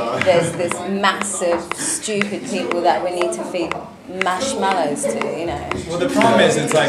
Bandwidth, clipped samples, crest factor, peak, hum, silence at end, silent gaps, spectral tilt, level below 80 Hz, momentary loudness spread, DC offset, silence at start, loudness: 14.5 kHz; under 0.1%; 18 dB; 0 dBFS; none; 0 s; none; -3.5 dB/octave; -50 dBFS; 9 LU; under 0.1%; 0 s; -19 LUFS